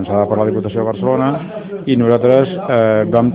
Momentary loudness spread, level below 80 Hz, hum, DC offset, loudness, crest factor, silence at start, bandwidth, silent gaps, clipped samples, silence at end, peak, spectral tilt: 8 LU; -52 dBFS; none; under 0.1%; -15 LUFS; 14 dB; 0 s; 4.9 kHz; none; under 0.1%; 0 s; 0 dBFS; -10.5 dB/octave